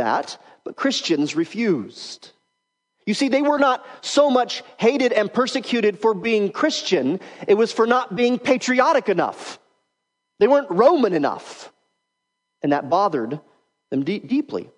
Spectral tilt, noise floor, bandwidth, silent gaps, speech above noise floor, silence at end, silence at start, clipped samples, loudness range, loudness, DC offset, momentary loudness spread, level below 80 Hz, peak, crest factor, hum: -4.5 dB/octave; -78 dBFS; 10.5 kHz; none; 58 dB; 0.15 s; 0 s; under 0.1%; 5 LU; -20 LUFS; under 0.1%; 16 LU; -74 dBFS; -2 dBFS; 18 dB; none